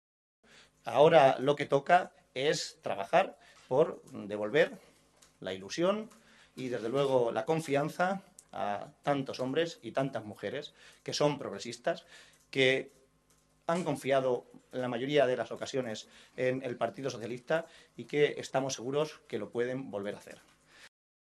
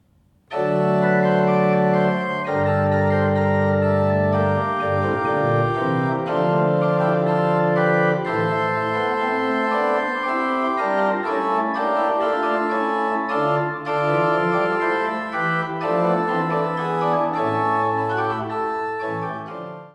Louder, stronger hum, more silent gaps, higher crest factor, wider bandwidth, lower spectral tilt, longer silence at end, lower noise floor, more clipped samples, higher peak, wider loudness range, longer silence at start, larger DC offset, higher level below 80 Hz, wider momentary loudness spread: second, -32 LUFS vs -20 LUFS; neither; neither; first, 24 dB vs 14 dB; first, 13 kHz vs 10.5 kHz; second, -5 dB/octave vs -8 dB/octave; first, 0.45 s vs 0.05 s; first, -69 dBFS vs -58 dBFS; neither; about the same, -8 dBFS vs -6 dBFS; first, 6 LU vs 2 LU; first, 0.85 s vs 0.5 s; neither; second, -76 dBFS vs -62 dBFS; first, 14 LU vs 5 LU